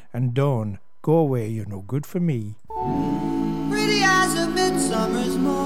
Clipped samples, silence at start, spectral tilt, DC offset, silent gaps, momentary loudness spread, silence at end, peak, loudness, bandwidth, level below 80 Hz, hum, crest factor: under 0.1%; 0.15 s; -5 dB/octave; 1%; none; 12 LU; 0 s; -8 dBFS; -22 LUFS; 17 kHz; -46 dBFS; none; 14 dB